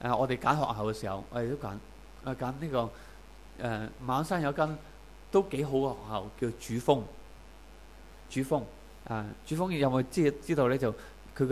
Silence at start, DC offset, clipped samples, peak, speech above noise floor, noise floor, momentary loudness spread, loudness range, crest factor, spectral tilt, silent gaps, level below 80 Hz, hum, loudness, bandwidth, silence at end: 0 s; 0.1%; under 0.1%; -10 dBFS; 21 dB; -52 dBFS; 18 LU; 4 LU; 22 dB; -6.5 dB/octave; none; -52 dBFS; none; -32 LUFS; 15.5 kHz; 0 s